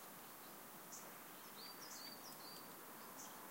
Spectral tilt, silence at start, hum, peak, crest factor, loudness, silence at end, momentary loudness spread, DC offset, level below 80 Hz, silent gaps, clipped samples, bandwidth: -1.5 dB/octave; 0 s; none; -40 dBFS; 16 dB; -53 LUFS; 0 s; 3 LU; under 0.1%; under -90 dBFS; none; under 0.1%; 16 kHz